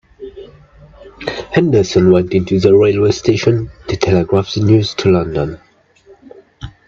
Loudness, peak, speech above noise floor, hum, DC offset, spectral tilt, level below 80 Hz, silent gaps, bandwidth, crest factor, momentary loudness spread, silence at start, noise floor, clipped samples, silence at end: -13 LUFS; 0 dBFS; 34 dB; none; under 0.1%; -6.5 dB/octave; -40 dBFS; none; 7.6 kHz; 14 dB; 16 LU; 0.2 s; -47 dBFS; under 0.1%; 0.2 s